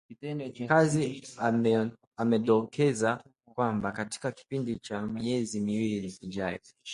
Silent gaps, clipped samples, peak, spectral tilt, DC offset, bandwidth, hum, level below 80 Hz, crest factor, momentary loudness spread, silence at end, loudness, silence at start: 2.07-2.11 s; under 0.1%; -8 dBFS; -6 dB/octave; under 0.1%; 11.5 kHz; none; -64 dBFS; 22 dB; 12 LU; 0 s; -30 LUFS; 0.1 s